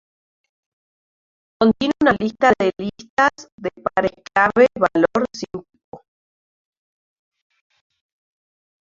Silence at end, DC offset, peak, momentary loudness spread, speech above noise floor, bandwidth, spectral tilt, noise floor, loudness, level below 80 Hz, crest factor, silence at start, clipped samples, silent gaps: 2.9 s; under 0.1%; -2 dBFS; 15 LU; over 71 dB; 7.6 kHz; -5.5 dB/octave; under -90 dBFS; -18 LUFS; -54 dBFS; 20 dB; 1.6 s; under 0.1%; 3.10-3.17 s, 3.52-3.58 s, 5.84-5.92 s